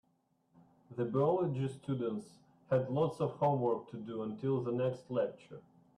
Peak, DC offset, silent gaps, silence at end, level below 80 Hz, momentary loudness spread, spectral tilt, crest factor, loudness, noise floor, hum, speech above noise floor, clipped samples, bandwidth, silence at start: -18 dBFS; under 0.1%; none; 0.35 s; -74 dBFS; 12 LU; -9 dB/octave; 16 dB; -35 LUFS; -76 dBFS; none; 41 dB; under 0.1%; 11 kHz; 0.9 s